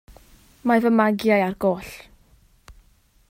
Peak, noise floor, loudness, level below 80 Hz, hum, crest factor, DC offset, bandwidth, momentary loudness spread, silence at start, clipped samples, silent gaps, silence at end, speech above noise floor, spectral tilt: -4 dBFS; -58 dBFS; -21 LUFS; -54 dBFS; none; 20 dB; under 0.1%; 16 kHz; 16 LU; 0.65 s; under 0.1%; none; 0.6 s; 38 dB; -6.5 dB/octave